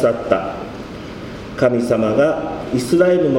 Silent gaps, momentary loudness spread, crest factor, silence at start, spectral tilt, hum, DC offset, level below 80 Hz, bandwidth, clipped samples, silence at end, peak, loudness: none; 16 LU; 18 dB; 0 s; -6.5 dB/octave; none; under 0.1%; -44 dBFS; 16 kHz; under 0.1%; 0 s; 0 dBFS; -17 LUFS